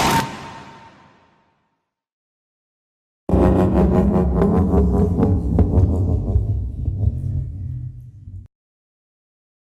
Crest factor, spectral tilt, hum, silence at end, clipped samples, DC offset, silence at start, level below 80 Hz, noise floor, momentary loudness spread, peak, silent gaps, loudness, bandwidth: 16 dB; -7.5 dB/octave; none; 1.35 s; under 0.1%; under 0.1%; 0 s; -26 dBFS; -73 dBFS; 19 LU; -4 dBFS; 2.12-3.27 s; -19 LUFS; 15 kHz